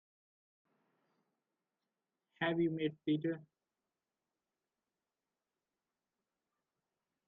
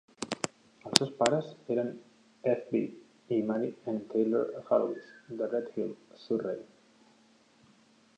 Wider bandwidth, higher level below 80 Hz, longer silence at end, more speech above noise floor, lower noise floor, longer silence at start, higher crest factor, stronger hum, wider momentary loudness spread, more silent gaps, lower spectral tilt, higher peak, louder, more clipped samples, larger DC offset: second, 4 kHz vs 12.5 kHz; second, -84 dBFS vs -74 dBFS; first, 3.85 s vs 1.5 s; first, over 54 dB vs 32 dB; first, under -90 dBFS vs -63 dBFS; first, 2.4 s vs 0.2 s; second, 20 dB vs 34 dB; neither; second, 6 LU vs 13 LU; neither; first, -5.5 dB/octave vs -4 dB/octave; second, -24 dBFS vs 0 dBFS; second, -37 LUFS vs -32 LUFS; neither; neither